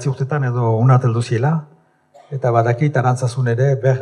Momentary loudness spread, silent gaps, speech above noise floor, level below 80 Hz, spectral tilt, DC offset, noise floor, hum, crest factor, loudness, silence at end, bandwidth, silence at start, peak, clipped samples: 7 LU; none; 34 dB; -68 dBFS; -8 dB/octave; under 0.1%; -50 dBFS; none; 16 dB; -17 LUFS; 0 s; 10 kHz; 0 s; 0 dBFS; under 0.1%